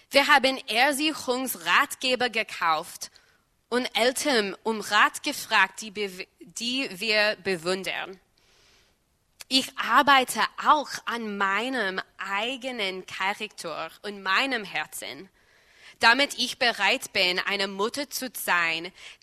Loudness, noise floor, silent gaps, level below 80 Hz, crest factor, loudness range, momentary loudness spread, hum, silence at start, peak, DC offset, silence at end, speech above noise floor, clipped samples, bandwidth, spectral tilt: -24 LUFS; -68 dBFS; none; -68 dBFS; 24 dB; 5 LU; 13 LU; none; 0.1 s; -4 dBFS; under 0.1%; 0.1 s; 42 dB; under 0.1%; 13.5 kHz; -1.5 dB/octave